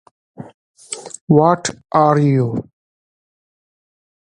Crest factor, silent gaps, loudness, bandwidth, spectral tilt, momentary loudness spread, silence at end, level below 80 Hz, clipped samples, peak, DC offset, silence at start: 18 dB; 0.54-0.75 s, 1.21-1.28 s; -15 LUFS; 11 kHz; -6.5 dB/octave; 16 LU; 1.7 s; -56 dBFS; under 0.1%; 0 dBFS; under 0.1%; 0.4 s